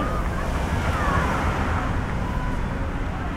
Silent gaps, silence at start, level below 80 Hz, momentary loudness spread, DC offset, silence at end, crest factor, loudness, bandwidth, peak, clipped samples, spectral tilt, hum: none; 0 s; -28 dBFS; 6 LU; under 0.1%; 0 s; 14 dB; -25 LUFS; 15.5 kHz; -10 dBFS; under 0.1%; -6.5 dB/octave; none